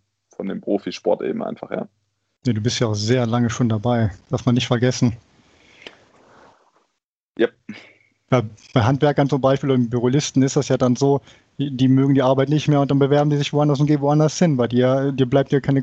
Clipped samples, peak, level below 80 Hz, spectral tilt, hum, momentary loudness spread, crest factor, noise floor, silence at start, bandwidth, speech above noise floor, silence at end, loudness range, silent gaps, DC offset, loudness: under 0.1%; 0 dBFS; -54 dBFS; -6.5 dB/octave; none; 11 LU; 18 dB; -77 dBFS; 0.4 s; 8.2 kHz; 59 dB; 0 s; 8 LU; 7.04-7.35 s; under 0.1%; -19 LUFS